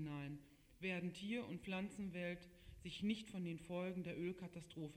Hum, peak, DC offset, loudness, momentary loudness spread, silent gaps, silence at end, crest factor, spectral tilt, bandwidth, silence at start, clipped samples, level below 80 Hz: none; -32 dBFS; under 0.1%; -47 LUFS; 9 LU; none; 0 s; 16 dB; -6 dB/octave; 13.5 kHz; 0 s; under 0.1%; -70 dBFS